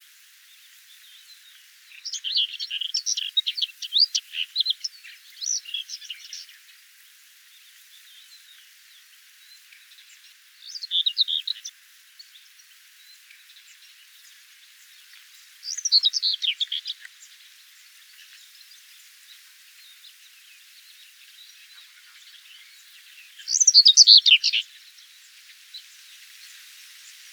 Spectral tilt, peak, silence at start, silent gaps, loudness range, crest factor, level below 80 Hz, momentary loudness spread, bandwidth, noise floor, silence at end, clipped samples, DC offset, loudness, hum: 12.5 dB/octave; 0 dBFS; 2.05 s; none; 18 LU; 26 dB; under -90 dBFS; 31 LU; over 20 kHz; -53 dBFS; 1.55 s; under 0.1%; under 0.1%; -19 LUFS; none